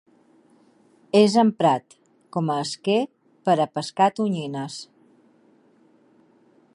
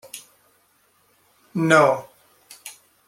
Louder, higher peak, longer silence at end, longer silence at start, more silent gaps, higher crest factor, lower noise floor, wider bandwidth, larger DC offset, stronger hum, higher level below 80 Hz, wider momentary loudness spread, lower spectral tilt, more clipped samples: second, -22 LUFS vs -19 LUFS; about the same, -2 dBFS vs -2 dBFS; first, 1.9 s vs 0.4 s; first, 1.15 s vs 0.15 s; neither; about the same, 22 dB vs 22 dB; second, -58 dBFS vs -62 dBFS; second, 11 kHz vs 16.5 kHz; neither; neither; second, -76 dBFS vs -68 dBFS; second, 14 LU vs 24 LU; about the same, -5.5 dB/octave vs -5 dB/octave; neither